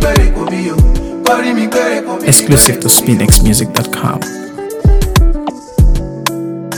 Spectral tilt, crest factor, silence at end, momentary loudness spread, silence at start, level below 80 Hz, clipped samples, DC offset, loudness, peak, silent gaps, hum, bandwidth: -4 dB/octave; 10 dB; 0 s; 11 LU; 0 s; -14 dBFS; 0.8%; under 0.1%; -11 LUFS; 0 dBFS; none; none; over 20 kHz